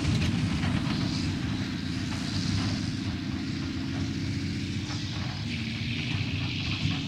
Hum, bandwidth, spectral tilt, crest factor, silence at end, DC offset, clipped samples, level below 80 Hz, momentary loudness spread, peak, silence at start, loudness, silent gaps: none; 12.5 kHz; -5.5 dB/octave; 14 dB; 0 s; under 0.1%; under 0.1%; -46 dBFS; 4 LU; -14 dBFS; 0 s; -30 LUFS; none